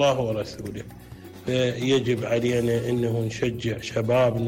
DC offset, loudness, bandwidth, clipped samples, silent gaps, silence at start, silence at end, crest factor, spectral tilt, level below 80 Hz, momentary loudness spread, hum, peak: under 0.1%; -25 LUFS; 16 kHz; under 0.1%; none; 0 s; 0 s; 12 dB; -6 dB/octave; -52 dBFS; 14 LU; none; -12 dBFS